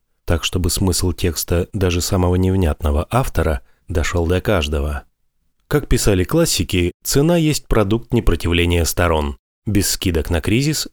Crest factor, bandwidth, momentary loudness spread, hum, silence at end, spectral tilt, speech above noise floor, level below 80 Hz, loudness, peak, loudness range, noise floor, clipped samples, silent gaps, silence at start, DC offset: 16 dB; 19.5 kHz; 6 LU; none; 0.05 s; -5 dB/octave; 47 dB; -26 dBFS; -18 LUFS; -2 dBFS; 3 LU; -64 dBFS; under 0.1%; 6.94-7.00 s, 9.39-9.62 s; 0.25 s; under 0.1%